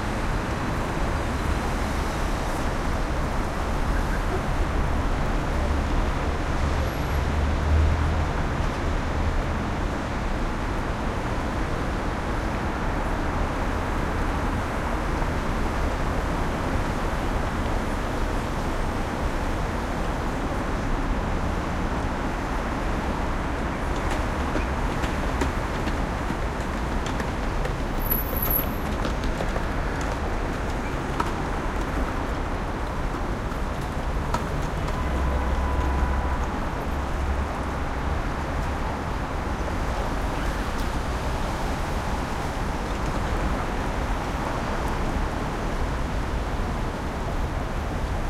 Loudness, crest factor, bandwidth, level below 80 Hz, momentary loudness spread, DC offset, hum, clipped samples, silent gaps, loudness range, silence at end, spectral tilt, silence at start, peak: -27 LUFS; 18 dB; 16 kHz; -28 dBFS; 3 LU; under 0.1%; none; under 0.1%; none; 3 LU; 0 s; -6 dB/octave; 0 s; -8 dBFS